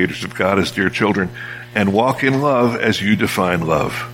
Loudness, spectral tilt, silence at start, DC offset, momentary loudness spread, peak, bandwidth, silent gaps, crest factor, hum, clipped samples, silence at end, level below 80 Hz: -17 LUFS; -5.5 dB/octave; 0 s; under 0.1%; 5 LU; 0 dBFS; 16.5 kHz; none; 16 dB; none; under 0.1%; 0 s; -46 dBFS